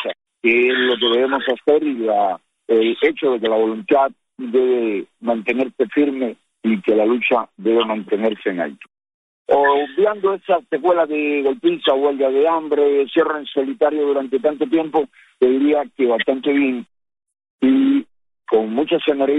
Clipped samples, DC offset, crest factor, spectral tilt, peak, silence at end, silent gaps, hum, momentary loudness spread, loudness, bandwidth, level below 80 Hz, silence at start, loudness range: under 0.1%; under 0.1%; 16 dB; -6.5 dB/octave; -2 dBFS; 0 s; 9.14-9.45 s, 17.50-17.59 s; none; 6 LU; -18 LUFS; 4 kHz; -64 dBFS; 0 s; 2 LU